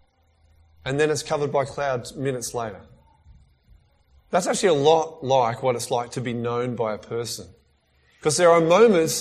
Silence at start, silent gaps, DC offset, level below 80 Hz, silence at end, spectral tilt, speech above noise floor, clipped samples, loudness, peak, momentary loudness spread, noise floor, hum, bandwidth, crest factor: 0.85 s; none; under 0.1%; -58 dBFS; 0 s; -4.5 dB/octave; 41 dB; under 0.1%; -22 LUFS; -4 dBFS; 13 LU; -62 dBFS; none; 14.5 kHz; 20 dB